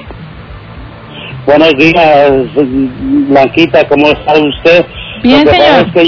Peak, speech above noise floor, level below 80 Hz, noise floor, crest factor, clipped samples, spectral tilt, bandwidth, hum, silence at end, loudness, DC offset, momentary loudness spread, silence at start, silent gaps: 0 dBFS; 21 dB; -32 dBFS; -27 dBFS; 8 dB; 6%; -6.5 dB/octave; 5.4 kHz; none; 0 s; -7 LUFS; under 0.1%; 20 LU; 0 s; none